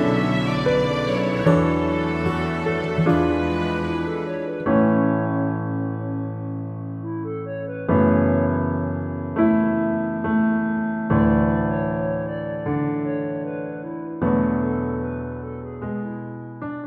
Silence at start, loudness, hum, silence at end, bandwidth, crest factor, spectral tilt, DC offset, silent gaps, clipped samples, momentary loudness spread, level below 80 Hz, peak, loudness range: 0 s; -22 LUFS; none; 0 s; 8.6 kHz; 18 dB; -8.5 dB/octave; under 0.1%; none; under 0.1%; 12 LU; -42 dBFS; -4 dBFS; 4 LU